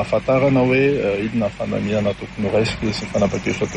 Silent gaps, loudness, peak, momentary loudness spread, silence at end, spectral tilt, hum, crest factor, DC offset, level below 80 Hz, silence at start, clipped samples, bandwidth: none; -19 LUFS; -4 dBFS; 8 LU; 0 s; -6.5 dB/octave; none; 14 dB; under 0.1%; -42 dBFS; 0 s; under 0.1%; 10 kHz